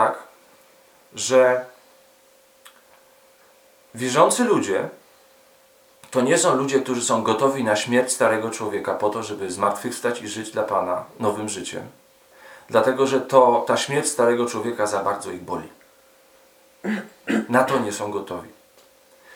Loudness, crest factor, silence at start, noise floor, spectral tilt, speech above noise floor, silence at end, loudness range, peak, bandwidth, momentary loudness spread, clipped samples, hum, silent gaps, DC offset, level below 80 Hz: -21 LUFS; 22 dB; 0 s; -55 dBFS; -3.5 dB/octave; 34 dB; 0.85 s; 6 LU; 0 dBFS; 19 kHz; 13 LU; under 0.1%; none; none; under 0.1%; -70 dBFS